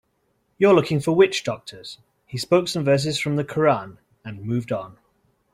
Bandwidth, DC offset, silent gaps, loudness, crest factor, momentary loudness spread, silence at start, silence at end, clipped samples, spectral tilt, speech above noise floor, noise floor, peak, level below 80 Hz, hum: 14.5 kHz; under 0.1%; none; -21 LUFS; 18 dB; 21 LU; 0.6 s; 0.6 s; under 0.1%; -5.5 dB/octave; 48 dB; -69 dBFS; -4 dBFS; -60 dBFS; none